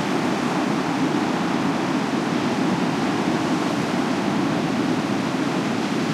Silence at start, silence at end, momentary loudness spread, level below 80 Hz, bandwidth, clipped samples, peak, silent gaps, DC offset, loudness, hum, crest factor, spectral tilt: 0 s; 0 s; 1 LU; -58 dBFS; 15 kHz; under 0.1%; -10 dBFS; none; under 0.1%; -22 LUFS; none; 12 dB; -5.5 dB/octave